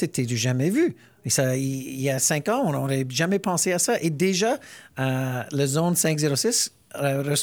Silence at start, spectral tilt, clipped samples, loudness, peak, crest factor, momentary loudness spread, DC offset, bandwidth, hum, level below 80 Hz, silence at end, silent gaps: 0 s; -4 dB/octave; under 0.1%; -23 LUFS; -8 dBFS; 16 dB; 6 LU; under 0.1%; over 20 kHz; none; -66 dBFS; 0 s; none